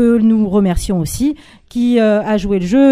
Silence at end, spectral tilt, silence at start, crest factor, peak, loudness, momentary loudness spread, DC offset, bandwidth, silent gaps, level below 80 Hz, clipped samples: 0 s; -6.5 dB/octave; 0 s; 12 dB; 0 dBFS; -14 LUFS; 7 LU; under 0.1%; 15.5 kHz; none; -30 dBFS; under 0.1%